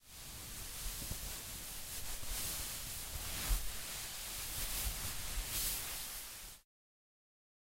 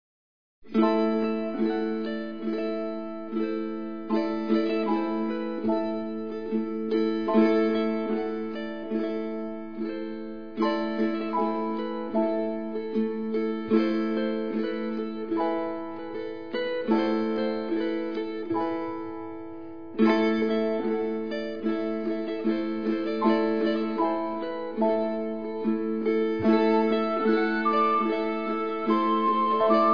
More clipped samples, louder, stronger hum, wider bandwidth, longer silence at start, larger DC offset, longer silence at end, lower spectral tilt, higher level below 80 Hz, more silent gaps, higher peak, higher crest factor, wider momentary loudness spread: neither; second, -41 LUFS vs -27 LUFS; neither; first, 16 kHz vs 5.4 kHz; second, 0 s vs 0.65 s; second, under 0.1% vs 0.6%; first, 1.05 s vs 0 s; second, -1.5 dB/octave vs -8 dB/octave; first, -48 dBFS vs -70 dBFS; neither; second, -22 dBFS vs -8 dBFS; about the same, 20 dB vs 18 dB; about the same, 9 LU vs 10 LU